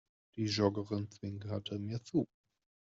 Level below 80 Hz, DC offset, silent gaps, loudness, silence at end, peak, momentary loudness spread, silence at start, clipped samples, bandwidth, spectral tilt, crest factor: -72 dBFS; under 0.1%; none; -37 LUFS; 0.65 s; -18 dBFS; 12 LU; 0.35 s; under 0.1%; 7.8 kHz; -6 dB/octave; 20 dB